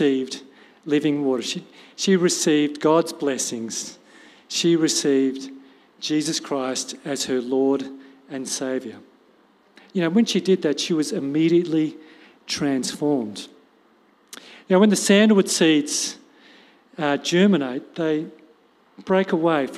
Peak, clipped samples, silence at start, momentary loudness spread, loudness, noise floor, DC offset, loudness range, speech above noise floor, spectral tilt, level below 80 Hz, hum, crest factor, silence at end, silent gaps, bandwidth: -4 dBFS; under 0.1%; 0 s; 18 LU; -21 LUFS; -58 dBFS; under 0.1%; 6 LU; 37 dB; -4 dB/octave; -72 dBFS; none; 20 dB; 0 s; none; 15 kHz